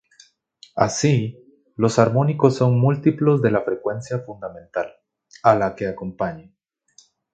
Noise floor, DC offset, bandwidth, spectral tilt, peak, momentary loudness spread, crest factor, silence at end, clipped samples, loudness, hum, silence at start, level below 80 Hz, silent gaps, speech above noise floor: -56 dBFS; under 0.1%; 9 kHz; -6.5 dB/octave; 0 dBFS; 15 LU; 20 dB; 0.9 s; under 0.1%; -20 LUFS; none; 0.75 s; -56 dBFS; none; 37 dB